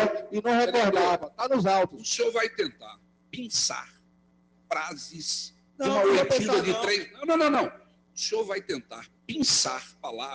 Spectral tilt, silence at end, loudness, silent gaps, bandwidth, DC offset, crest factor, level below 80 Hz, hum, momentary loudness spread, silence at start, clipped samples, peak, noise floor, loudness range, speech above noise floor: -3 dB/octave; 0 s; -26 LUFS; none; 10.5 kHz; under 0.1%; 16 dB; -66 dBFS; none; 14 LU; 0 s; under 0.1%; -12 dBFS; -63 dBFS; 5 LU; 36 dB